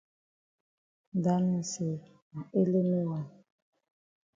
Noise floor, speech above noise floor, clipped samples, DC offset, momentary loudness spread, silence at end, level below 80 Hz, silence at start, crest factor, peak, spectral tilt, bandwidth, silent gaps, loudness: under -90 dBFS; over 60 dB; under 0.1%; under 0.1%; 16 LU; 1.05 s; -74 dBFS; 1.15 s; 18 dB; -14 dBFS; -7.5 dB/octave; 7.8 kHz; 2.22-2.31 s; -31 LUFS